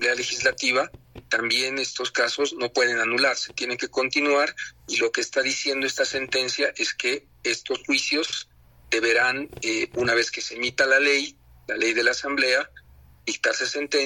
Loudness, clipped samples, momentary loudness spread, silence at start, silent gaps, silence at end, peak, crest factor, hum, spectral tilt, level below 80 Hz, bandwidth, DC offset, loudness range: -23 LUFS; under 0.1%; 7 LU; 0 s; none; 0 s; -6 dBFS; 18 dB; none; -1.5 dB/octave; -60 dBFS; 17.5 kHz; under 0.1%; 2 LU